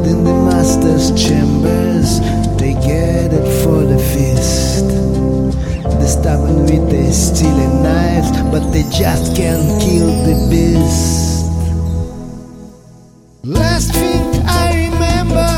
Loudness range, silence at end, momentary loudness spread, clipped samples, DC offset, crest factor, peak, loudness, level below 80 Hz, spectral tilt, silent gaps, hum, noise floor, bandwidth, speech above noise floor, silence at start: 4 LU; 0 s; 5 LU; under 0.1%; under 0.1%; 12 dB; 0 dBFS; -13 LUFS; -20 dBFS; -6 dB/octave; none; none; -41 dBFS; 17 kHz; 30 dB; 0 s